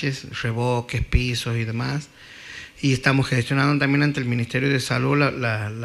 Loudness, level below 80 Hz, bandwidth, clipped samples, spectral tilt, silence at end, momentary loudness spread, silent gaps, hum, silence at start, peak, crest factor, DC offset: -22 LUFS; -36 dBFS; 13 kHz; under 0.1%; -6 dB/octave; 0 s; 10 LU; none; none; 0 s; -4 dBFS; 18 dB; under 0.1%